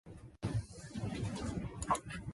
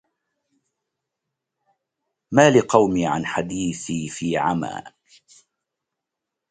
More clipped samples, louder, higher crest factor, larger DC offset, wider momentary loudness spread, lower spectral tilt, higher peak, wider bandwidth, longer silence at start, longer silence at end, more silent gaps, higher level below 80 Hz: neither; second, -40 LUFS vs -20 LUFS; about the same, 20 dB vs 24 dB; neither; second, 8 LU vs 13 LU; about the same, -5.5 dB/octave vs -5 dB/octave; second, -20 dBFS vs 0 dBFS; first, 11.5 kHz vs 9.6 kHz; second, 0.05 s vs 2.3 s; second, 0 s vs 1.6 s; neither; about the same, -52 dBFS vs -56 dBFS